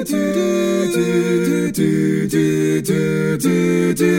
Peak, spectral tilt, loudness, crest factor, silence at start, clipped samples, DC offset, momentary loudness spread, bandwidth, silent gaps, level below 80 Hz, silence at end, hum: -2 dBFS; -6 dB/octave; -17 LUFS; 14 dB; 0 s; under 0.1%; under 0.1%; 2 LU; 17 kHz; none; -54 dBFS; 0 s; none